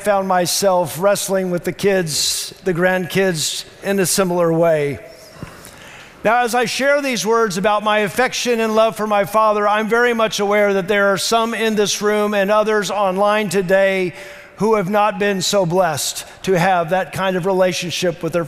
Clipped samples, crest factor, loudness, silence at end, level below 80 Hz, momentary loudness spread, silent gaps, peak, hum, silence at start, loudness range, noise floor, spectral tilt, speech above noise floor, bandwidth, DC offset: under 0.1%; 14 dB; -17 LUFS; 0 s; -52 dBFS; 7 LU; none; -4 dBFS; none; 0 s; 2 LU; -39 dBFS; -3.5 dB/octave; 22 dB; 16 kHz; under 0.1%